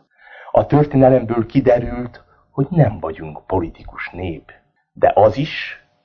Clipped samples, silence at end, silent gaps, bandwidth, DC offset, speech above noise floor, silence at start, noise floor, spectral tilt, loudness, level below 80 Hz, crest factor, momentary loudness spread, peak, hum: under 0.1%; 0.3 s; none; 6.6 kHz; under 0.1%; 25 dB; 0.35 s; -42 dBFS; -9.5 dB/octave; -17 LUFS; -40 dBFS; 18 dB; 17 LU; 0 dBFS; none